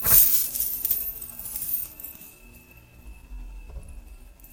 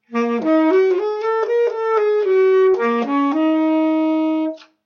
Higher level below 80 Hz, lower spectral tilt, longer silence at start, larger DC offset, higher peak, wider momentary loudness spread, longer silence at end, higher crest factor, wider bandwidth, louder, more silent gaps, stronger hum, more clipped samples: first, -44 dBFS vs -76 dBFS; second, -1 dB/octave vs -6 dB/octave; about the same, 0 s vs 0.1 s; neither; first, -2 dBFS vs -6 dBFS; first, 28 LU vs 6 LU; second, 0 s vs 0.25 s; first, 24 dB vs 10 dB; first, 17 kHz vs 6.6 kHz; second, -22 LUFS vs -17 LUFS; neither; neither; neither